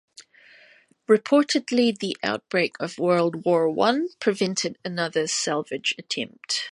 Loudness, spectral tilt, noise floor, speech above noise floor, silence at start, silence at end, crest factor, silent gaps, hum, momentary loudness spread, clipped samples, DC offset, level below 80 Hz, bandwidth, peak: -24 LUFS; -3.5 dB/octave; -56 dBFS; 32 dB; 0.2 s; 0 s; 18 dB; none; none; 8 LU; under 0.1%; under 0.1%; -72 dBFS; 11.5 kHz; -6 dBFS